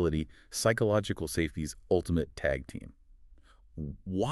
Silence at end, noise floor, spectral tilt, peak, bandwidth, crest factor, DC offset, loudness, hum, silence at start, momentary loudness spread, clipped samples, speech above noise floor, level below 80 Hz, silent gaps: 0 s; -57 dBFS; -5.5 dB/octave; -12 dBFS; 13.5 kHz; 20 dB; under 0.1%; -32 LUFS; none; 0 s; 15 LU; under 0.1%; 26 dB; -46 dBFS; none